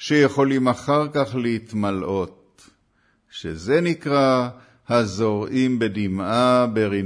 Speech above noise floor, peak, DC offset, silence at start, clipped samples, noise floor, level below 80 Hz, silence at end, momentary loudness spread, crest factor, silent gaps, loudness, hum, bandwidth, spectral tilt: 44 dB; -6 dBFS; under 0.1%; 0 s; under 0.1%; -64 dBFS; -56 dBFS; 0 s; 10 LU; 16 dB; none; -21 LUFS; none; 10.5 kHz; -6.5 dB/octave